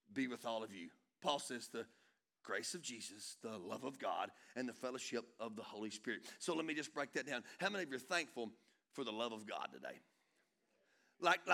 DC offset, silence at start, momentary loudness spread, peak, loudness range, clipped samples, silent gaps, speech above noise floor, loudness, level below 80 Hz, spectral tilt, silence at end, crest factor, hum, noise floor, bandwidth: under 0.1%; 0.1 s; 10 LU; -18 dBFS; 3 LU; under 0.1%; none; 37 dB; -44 LUFS; under -90 dBFS; -2.5 dB/octave; 0 s; 26 dB; none; -81 dBFS; 18.5 kHz